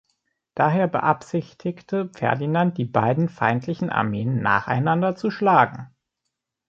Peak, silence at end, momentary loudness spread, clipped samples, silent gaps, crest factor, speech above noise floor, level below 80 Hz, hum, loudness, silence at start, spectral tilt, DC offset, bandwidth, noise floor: -2 dBFS; 0.8 s; 9 LU; under 0.1%; none; 20 dB; 59 dB; -60 dBFS; none; -22 LUFS; 0.55 s; -8 dB/octave; under 0.1%; 7.6 kHz; -81 dBFS